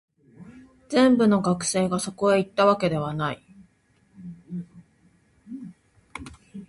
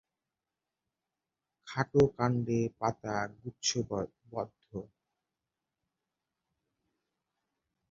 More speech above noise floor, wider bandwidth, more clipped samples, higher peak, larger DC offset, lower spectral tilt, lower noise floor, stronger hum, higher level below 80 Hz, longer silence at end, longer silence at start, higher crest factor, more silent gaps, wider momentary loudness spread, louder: second, 41 dB vs 58 dB; first, 11.5 kHz vs 7.2 kHz; neither; first, -6 dBFS vs -12 dBFS; neither; about the same, -5.5 dB/octave vs -5.5 dB/octave; second, -63 dBFS vs -90 dBFS; neither; first, -58 dBFS vs -64 dBFS; second, 0.05 s vs 3.05 s; second, 0.4 s vs 1.65 s; about the same, 20 dB vs 24 dB; neither; first, 23 LU vs 14 LU; first, -22 LUFS vs -33 LUFS